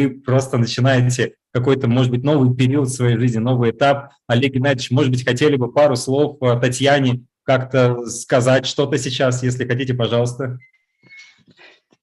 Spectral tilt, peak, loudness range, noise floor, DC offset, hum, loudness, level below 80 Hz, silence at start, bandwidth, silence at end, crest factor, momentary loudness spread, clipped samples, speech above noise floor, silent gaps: -6 dB/octave; -2 dBFS; 3 LU; -50 dBFS; under 0.1%; none; -17 LUFS; -56 dBFS; 0 s; 12 kHz; 0.8 s; 16 dB; 6 LU; under 0.1%; 33 dB; none